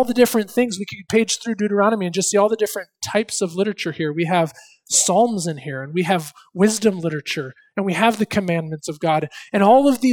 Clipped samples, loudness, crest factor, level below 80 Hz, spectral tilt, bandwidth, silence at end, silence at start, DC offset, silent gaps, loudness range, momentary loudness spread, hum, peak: under 0.1%; -20 LUFS; 18 dB; -60 dBFS; -4 dB/octave; 19 kHz; 0 s; 0 s; under 0.1%; none; 2 LU; 10 LU; none; 0 dBFS